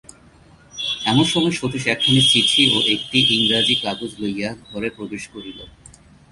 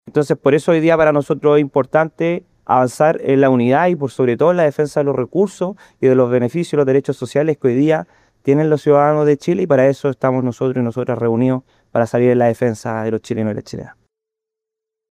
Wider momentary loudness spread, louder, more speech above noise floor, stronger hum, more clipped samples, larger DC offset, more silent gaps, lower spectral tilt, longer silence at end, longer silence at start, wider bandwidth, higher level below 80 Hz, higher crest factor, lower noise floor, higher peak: first, 18 LU vs 8 LU; about the same, -17 LUFS vs -16 LUFS; second, 30 dB vs 68 dB; neither; neither; neither; neither; second, -3.5 dB/octave vs -7.5 dB/octave; second, 0.65 s vs 1.2 s; first, 0.75 s vs 0.05 s; second, 11.5 kHz vs 13 kHz; first, -52 dBFS vs -58 dBFS; about the same, 18 dB vs 14 dB; second, -49 dBFS vs -83 dBFS; about the same, -2 dBFS vs -2 dBFS